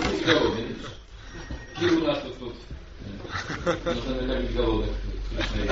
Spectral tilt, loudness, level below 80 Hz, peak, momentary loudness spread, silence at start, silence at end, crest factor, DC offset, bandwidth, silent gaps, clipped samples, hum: -4 dB/octave; -27 LUFS; -36 dBFS; -6 dBFS; 18 LU; 0 s; 0 s; 22 dB; under 0.1%; 7.8 kHz; none; under 0.1%; none